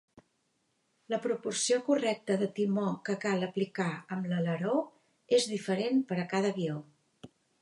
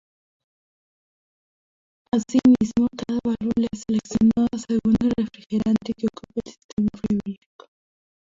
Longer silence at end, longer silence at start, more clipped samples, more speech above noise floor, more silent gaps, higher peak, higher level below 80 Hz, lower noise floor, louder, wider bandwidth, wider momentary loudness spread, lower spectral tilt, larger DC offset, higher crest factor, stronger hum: second, 0.35 s vs 0.95 s; second, 1.1 s vs 2.15 s; neither; second, 46 dB vs over 68 dB; second, none vs 6.64-6.77 s; second, -16 dBFS vs -6 dBFS; second, -80 dBFS vs -50 dBFS; second, -76 dBFS vs under -90 dBFS; second, -31 LUFS vs -23 LUFS; first, 11.5 kHz vs 7.6 kHz; second, 7 LU vs 12 LU; second, -5 dB/octave vs -7 dB/octave; neither; about the same, 18 dB vs 16 dB; neither